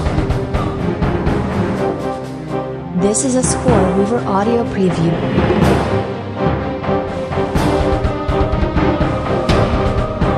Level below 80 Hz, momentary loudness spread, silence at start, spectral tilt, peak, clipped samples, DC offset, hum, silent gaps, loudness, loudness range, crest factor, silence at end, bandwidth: -24 dBFS; 6 LU; 0 s; -6 dB/octave; 0 dBFS; under 0.1%; under 0.1%; none; none; -17 LUFS; 3 LU; 16 dB; 0 s; 13.5 kHz